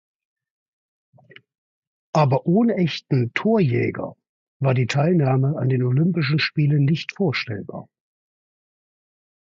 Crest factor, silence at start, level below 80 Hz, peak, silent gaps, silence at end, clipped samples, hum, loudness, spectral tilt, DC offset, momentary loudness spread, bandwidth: 18 dB; 2.15 s; -60 dBFS; -4 dBFS; 4.29-4.60 s; 1.65 s; under 0.1%; none; -21 LUFS; -7.5 dB/octave; under 0.1%; 9 LU; 7.6 kHz